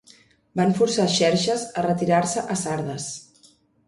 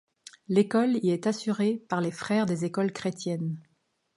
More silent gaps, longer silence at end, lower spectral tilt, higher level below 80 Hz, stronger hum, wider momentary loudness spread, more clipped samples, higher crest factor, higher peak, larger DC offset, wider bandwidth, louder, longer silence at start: neither; about the same, 0.65 s vs 0.55 s; second, -4.5 dB/octave vs -6.5 dB/octave; first, -60 dBFS vs -72 dBFS; neither; first, 12 LU vs 8 LU; neither; about the same, 18 dB vs 18 dB; first, -6 dBFS vs -10 dBFS; neither; about the same, 11.5 kHz vs 11.5 kHz; first, -22 LUFS vs -28 LUFS; about the same, 0.55 s vs 0.5 s